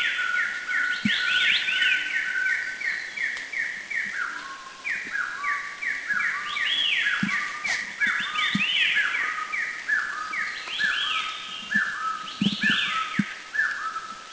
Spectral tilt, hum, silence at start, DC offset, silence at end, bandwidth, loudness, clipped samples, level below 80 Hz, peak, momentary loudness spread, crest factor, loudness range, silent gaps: -2 dB/octave; none; 0 s; under 0.1%; 0 s; 8 kHz; -25 LUFS; under 0.1%; -66 dBFS; -8 dBFS; 8 LU; 18 dB; 5 LU; none